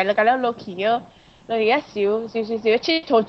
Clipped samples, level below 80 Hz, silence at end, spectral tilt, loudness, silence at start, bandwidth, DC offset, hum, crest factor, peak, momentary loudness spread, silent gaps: under 0.1%; -62 dBFS; 0 s; -5 dB/octave; -21 LUFS; 0 s; 6.4 kHz; under 0.1%; none; 16 dB; -6 dBFS; 7 LU; none